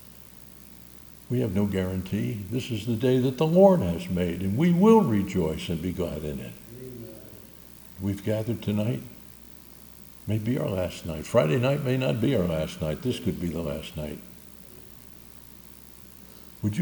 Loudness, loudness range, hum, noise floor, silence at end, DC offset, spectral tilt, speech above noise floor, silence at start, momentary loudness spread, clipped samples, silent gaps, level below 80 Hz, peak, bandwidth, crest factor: -26 LUFS; 10 LU; none; -47 dBFS; 0 s; under 0.1%; -7.5 dB/octave; 23 dB; 0 s; 24 LU; under 0.1%; none; -50 dBFS; -6 dBFS; 19.5 kHz; 22 dB